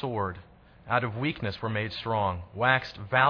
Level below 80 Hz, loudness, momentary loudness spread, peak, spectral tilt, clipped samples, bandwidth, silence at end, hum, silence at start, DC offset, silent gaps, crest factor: -56 dBFS; -29 LUFS; 8 LU; -8 dBFS; -7.5 dB/octave; under 0.1%; 5.4 kHz; 0 s; none; 0 s; under 0.1%; none; 22 dB